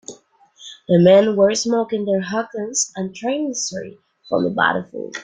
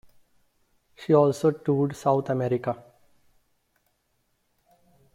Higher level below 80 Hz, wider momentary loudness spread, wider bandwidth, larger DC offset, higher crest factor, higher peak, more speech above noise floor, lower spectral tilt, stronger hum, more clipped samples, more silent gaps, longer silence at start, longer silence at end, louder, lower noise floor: about the same, -62 dBFS vs -66 dBFS; first, 19 LU vs 12 LU; second, 9.6 kHz vs 15 kHz; neither; about the same, 18 dB vs 20 dB; first, -2 dBFS vs -6 dBFS; second, 32 dB vs 49 dB; second, -4.5 dB/octave vs -8 dB/octave; neither; neither; neither; second, 0.1 s vs 1 s; second, 0 s vs 2.4 s; first, -18 LUFS vs -24 LUFS; second, -50 dBFS vs -72 dBFS